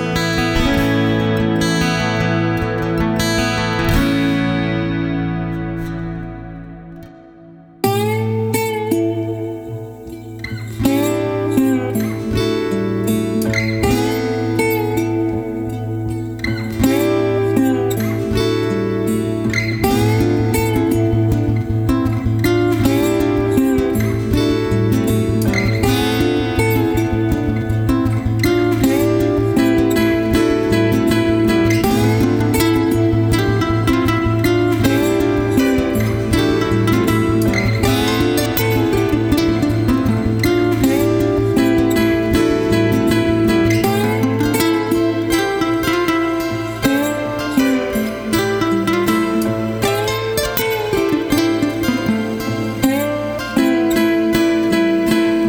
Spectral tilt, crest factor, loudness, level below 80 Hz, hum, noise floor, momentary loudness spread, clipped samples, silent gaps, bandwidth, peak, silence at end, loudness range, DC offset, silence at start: -6 dB/octave; 16 dB; -16 LUFS; -32 dBFS; none; -40 dBFS; 5 LU; under 0.1%; none; over 20 kHz; 0 dBFS; 0 s; 5 LU; under 0.1%; 0 s